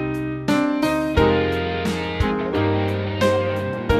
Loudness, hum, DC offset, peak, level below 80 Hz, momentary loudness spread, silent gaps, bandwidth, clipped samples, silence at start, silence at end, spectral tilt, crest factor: -21 LUFS; none; under 0.1%; -4 dBFS; -34 dBFS; 6 LU; none; 14 kHz; under 0.1%; 0 s; 0 s; -6.5 dB/octave; 16 dB